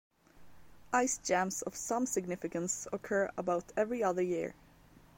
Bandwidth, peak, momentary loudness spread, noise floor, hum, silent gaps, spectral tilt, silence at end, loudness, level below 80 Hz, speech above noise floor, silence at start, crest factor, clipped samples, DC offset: 16.5 kHz; -16 dBFS; 6 LU; -60 dBFS; none; none; -4 dB/octave; 0.65 s; -34 LUFS; -66 dBFS; 26 dB; 0.35 s; 20 dB; under 0.1%; under 0.1%